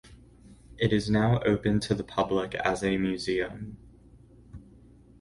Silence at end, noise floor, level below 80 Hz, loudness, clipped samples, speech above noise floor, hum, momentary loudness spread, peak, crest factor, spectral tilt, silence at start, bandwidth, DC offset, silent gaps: 0.6 s; -54 dBFS; -50 dBFS; -27 LUFS; under 0.1%; 27 dB; none; 6 LU; -10 dBFS; 18 dB; -6.5 dB/octave; 0.05 s; 11.5 kHz; under 0.1%; none